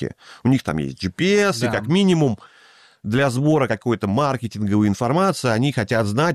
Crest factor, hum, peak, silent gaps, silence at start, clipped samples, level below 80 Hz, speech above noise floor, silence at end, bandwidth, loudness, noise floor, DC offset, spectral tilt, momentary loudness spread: 12 dB; none; -8 dBFS; none; 0 s; under 0.1%; -52 dBFS; 32 dB; 0 s; 14 kHz; -20 LUFS; -51 dBFS; under 0.1%; -6 dB/octave; 7 LU